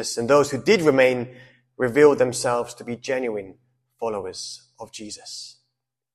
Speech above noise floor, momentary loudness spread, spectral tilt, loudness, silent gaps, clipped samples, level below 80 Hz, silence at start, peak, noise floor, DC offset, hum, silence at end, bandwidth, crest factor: 58 dB; 20 LU; -4.5 dB/octave; -21 LUFS; none; under 0.1%; -60 dBFS; 0 s; -2 dBFS; -80 dBFS; under 0.1%; none; 0.65 s; 14 kHz; 20 dB